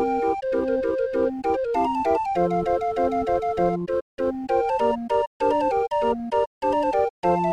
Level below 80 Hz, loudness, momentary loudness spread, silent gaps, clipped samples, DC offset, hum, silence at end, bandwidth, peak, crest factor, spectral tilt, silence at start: -48 dBFS; -23 LUFS; 3 LU; 4.02-4.18 s, 5.27-5.40 s, 6.47-6.61 s, 7.10-7.23 s; under 0.1%; under 0.1%; none; 0 s; 10 kHz; -10 dBFS; 14 dB; -7.5 dB/octave; 0 s